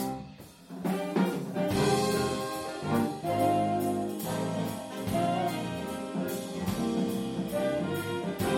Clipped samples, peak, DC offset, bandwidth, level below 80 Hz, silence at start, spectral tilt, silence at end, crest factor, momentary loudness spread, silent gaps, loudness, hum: under 0.1%; -14 dBFS; under 0.1%; 16.5 kHz; -58 dBFS; 0 s; -5.5 dB/octave; 0 s; 18 dB; 9 LU; none; -31 LUFS; none